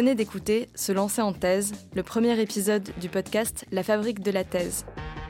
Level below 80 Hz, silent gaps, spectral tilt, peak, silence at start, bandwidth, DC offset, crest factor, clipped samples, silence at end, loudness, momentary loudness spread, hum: -50 dBFS; none; -4.5 dB/octave; -12 dBFS; 0 s; 17 kHz; under 0.1%; 14 dB; under 0.1%; 0 s; -27 LUFS; 6 LU; none